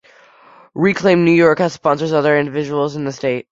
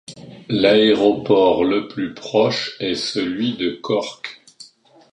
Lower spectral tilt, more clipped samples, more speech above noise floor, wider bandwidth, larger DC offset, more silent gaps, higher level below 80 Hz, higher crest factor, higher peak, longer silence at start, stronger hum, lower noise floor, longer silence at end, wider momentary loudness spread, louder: first, -6.5 dB/octave vs -5 dB/octave; neither; about the same, 32 dB vs 32 dB; second, 7.8 kHz vs 10.5 kHz; neither; neither; about the same, -56 dBFS vs -56 dBFS; about the same, 14 dB vs 18 dB; about the same, -2 dBFS vs -2 dBFS; first, 0.75 s vs 0.1 s; neither; about the same, -47 dBFS vs -50 dBFS; second, 0.1 s vs 0.5 s; second, 9 LU vs 15 LU; first, -15 LUFS vs -18 LUFS